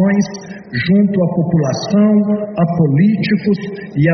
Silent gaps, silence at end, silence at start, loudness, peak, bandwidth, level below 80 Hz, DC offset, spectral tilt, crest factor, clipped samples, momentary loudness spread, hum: none; 0 s; 0 s; -15 LUFS; -2 dBFS; 6.4 kHz; -50 dBFS; under 0.1%; -7 dB/octave; 12 dB; under 0.1%; 9 LU; none